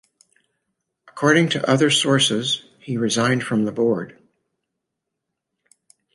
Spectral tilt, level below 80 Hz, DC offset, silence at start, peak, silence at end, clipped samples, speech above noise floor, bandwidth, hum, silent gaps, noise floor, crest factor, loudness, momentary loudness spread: -4 dB/octave; -66 dBFS; under 0.1%; 1.15 s; -2 dBFS; 2.05 s; under 0.1%; 62 dB; 11.5 kHz; none; none; -81 dBFS; 20 dB; -19 LUFS; 9 LU